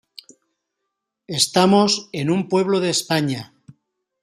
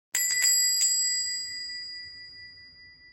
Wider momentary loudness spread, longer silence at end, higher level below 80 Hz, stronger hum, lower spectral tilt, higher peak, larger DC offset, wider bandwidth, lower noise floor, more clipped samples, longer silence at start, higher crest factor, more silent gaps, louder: second, 10 LU vs 22 LU; first, 0.8 s vs 0.05 s; first, -64 dBFS vs -72 dBFS; neither; first, -4 dB/octave vs 4.5 dB/octave; first, -2 dBFS vs -10 dBFS; neither; about the same, 15 kHz vs 16.5 kHz; first, -79 dBFS vs -52 dBFS; neither; first, 1.3 s vs 0.15 s; about the same, 20 dB vs 18 dB; neither; first, -19 LUFS vs -23 LUFS